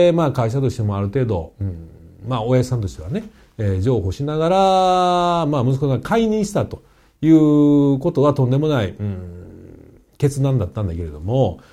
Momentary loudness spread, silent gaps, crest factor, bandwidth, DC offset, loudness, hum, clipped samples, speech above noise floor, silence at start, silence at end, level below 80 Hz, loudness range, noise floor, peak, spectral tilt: 14 LU; none; 14 dB; 13.5 kHz; under 0.1%; -18 LUFS; none; under 0.1%; 27 dB; 0 s; 0.15 s; -42 dBFS; 6 LU; -45 dBFS; -4 dBFS; -7.5 dB/octave